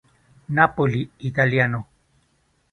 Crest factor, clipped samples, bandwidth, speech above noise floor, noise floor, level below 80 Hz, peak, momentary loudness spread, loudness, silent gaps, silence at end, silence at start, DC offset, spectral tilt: 22 dB; under 0.1%; 6.4 kHz; 45 dB; -65 dBFS; -54 dBFS; 0 dBFS; 8 LU; -21 LUFS; none; 0.9 s; 0.5 s; under 0.1%; -8 dB/octave